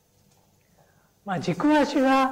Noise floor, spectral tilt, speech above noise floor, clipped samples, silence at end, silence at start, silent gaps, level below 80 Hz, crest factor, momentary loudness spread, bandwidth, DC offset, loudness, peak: -62 dBFS; -5.5 dB/octave; 40 dB; under 0.1%; 0 s; 1.25 s; none; -60 dBFS; 12 dB; 12 LU; 15.5 kHz; under 0.1%; -23 LUFS; -14 dBFS